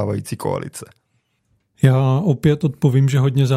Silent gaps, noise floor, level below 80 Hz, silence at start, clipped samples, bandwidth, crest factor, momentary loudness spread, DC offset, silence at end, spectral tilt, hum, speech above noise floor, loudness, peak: none; -67 dBFS; -52 dBFS; 0 s; under 0.1%; 14 kHz; 18 dB; 10 LU; under 0.1%; 0 s; -7.5 dB/octave; none; 50 dB; -18 LUFS; 0 dBFS